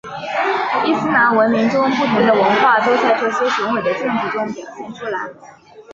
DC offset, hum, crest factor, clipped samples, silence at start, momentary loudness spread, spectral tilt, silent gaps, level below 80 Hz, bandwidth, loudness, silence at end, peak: under 0.1%; none; 14 dB; under 0.1%; 0.05 s; 13 LU; -5.5 dB/octave; none; -58 dBFS; 7.6 kHz; -16 LUFS; 0 s; -2 dBFS